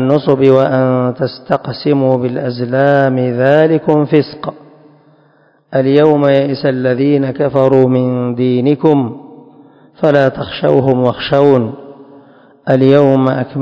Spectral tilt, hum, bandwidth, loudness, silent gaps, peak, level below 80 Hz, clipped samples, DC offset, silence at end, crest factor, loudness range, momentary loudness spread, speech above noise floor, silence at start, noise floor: -9.5 dB/octave; none; 6.4 kHz; -12 LUFS; none; 0 dBFS; -52 dBFS; 0.7%; under 0.1%; 0 s; 12 dB; 2 LU; 9 LU; 39 dB; 0 s; -51 dBFS